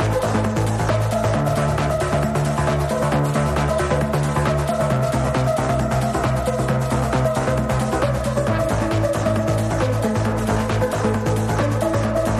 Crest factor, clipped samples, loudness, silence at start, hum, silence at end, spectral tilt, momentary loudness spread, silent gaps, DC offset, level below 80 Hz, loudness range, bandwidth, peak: 14 dB; under 0.1%; -20 LUFS; 0 s; none; 0 s; -6.5 dB/octave; 1 LU; none; under 0.1%; -32 dBFS; 1 LU; 14.5 kHz; -6 dBFS